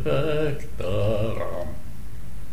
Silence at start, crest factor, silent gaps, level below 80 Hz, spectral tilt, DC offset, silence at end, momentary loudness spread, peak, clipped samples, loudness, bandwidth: 0 s; 16 dB; none; -38 dBFS; -7 dB/octave; 6%; 0 s; 17 LU; -10 dBFS; under 0.1%; -27 LUFS; 16 kHz